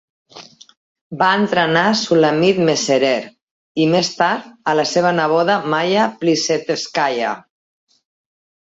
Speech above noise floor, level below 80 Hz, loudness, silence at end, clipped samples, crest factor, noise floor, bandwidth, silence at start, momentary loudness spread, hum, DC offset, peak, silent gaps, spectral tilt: 25 dB; -62 dBFS; -16 LUFS; 1.25 s; under 0.1%; 16 dB; -41 dBFS; 8 kHz; 0.35 s; 8 LU; none; under 0.1%; -2 dBFS; 0.77-0.95 s, 1.01-1.10 s, 3.42-3.75 s; -4 dB/octave